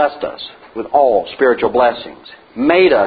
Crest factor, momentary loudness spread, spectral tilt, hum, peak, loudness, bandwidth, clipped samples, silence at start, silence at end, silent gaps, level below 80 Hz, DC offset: 14 dB; 18 LU; -9.5 dB/octave; none; 0 dBFS; -14 LUFS; 5 kHz; under 0.1%; 0 s; 0 s; none; -50 dBFS; under 0.1%